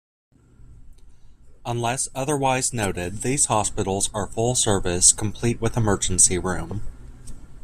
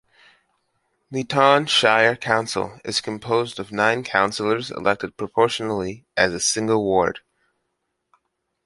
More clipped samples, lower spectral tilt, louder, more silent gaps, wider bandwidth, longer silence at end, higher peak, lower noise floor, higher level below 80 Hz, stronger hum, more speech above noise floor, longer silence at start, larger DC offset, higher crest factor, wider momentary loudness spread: neither; about the same, -3.5 dB/octave vs -3 dB/octave; about the same, -21 LUFS vs -21 LUFS; neither; first, 15 kHz vs 11.5 kHz; second, 0.05 s vs 1.5 s; about the same, 0 dBFS vs -2 dBFS; second, -46 dBFS vs -76 dBFS; first, -38 dBFS vs -56 dBFS; neither; second, 24 dB vs 55 dB; second, 0.6 s vs 1.1 s; neither; about the same, 24 dB vs 20 dB; about the same, 12 LU vs 11 LU